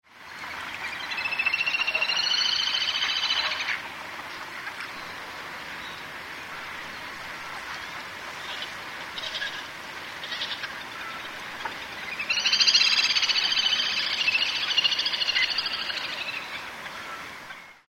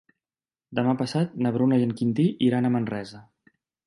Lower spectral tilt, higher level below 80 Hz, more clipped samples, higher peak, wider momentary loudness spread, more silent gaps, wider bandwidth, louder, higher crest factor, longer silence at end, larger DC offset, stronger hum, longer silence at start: second, 0.5 dB/octave vs -8 dB/octave; about the same, -64 dBFS vs -66 dBFS; neither; first, -6 dBFS vs -10 dBFS; first, 15 LU vs 10 LU; neither; first, 16 kHz vs 11.5 kHz; about the same, -25 LUFS vs -24 LUFS; first, 22 dB vs 16 dB; second, 0.1 s vs 0.65 s; neither; neither; second, 0.1 s vs 0.7 s